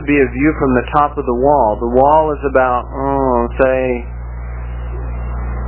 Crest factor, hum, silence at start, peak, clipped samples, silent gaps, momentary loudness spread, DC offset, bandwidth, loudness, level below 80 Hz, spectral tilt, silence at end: 14 dB; 60 Hz at -25 dBFS; 0 s; 0 dBFS; under 0.1%; none; 14 LU; under 0.1%; 4 kHz; -15 LUFS; -26 dBFS; -11.5 dB/octave; 0 s